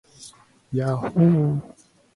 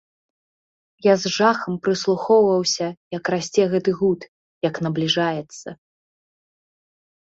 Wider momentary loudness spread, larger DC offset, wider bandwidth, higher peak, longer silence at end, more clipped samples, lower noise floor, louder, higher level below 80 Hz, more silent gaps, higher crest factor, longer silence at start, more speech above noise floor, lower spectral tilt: about the same, 12 LU vs 11 LU; neither; first, 11.5 kHz vs 8 kHz; about the same, -6 dBFS vs -4 dBFS; second, 0.45 s vs 1.55 s; neither; second, -48 dBFS vs under -90 dBFS; about the same, -22 LUFS vs -21 LUFS; first, -58 dBFS vs -64 dBFS; second, none vs 2.97-3.11 s, 4.28-4.61 s; about the same, 16 dB vs 18 dB; second, 0.2 s vs 1.05 s; second, 28 dB vs over 70 dB; first, -9 dB/octave vs -4.5 dB/octave